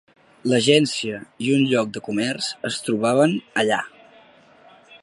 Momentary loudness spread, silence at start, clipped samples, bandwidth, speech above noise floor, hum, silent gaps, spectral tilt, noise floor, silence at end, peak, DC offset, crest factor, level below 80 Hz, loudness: 10 LU; 0.45 s; under 0.1%; 11.5 kHz; 30 dB; none; none; -4.5 dB/octave; -51 dBFS; 0.05 s; -2 dBFS; under 0.1%; 20 dB; -66 dBFS; -21 LUFS